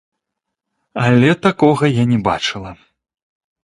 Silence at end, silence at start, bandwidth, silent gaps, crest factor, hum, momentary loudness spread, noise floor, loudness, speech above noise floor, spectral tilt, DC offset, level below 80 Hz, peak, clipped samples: 0.9 s; 0.95 s; 11 kHz; none; 16 dB; none; 17 LU; -79 dBFS; -15 LUFS; 65 dB; -6.5 dB/octave; under 0.1%; -48 dBFS; 0 dBFS; under 0.1%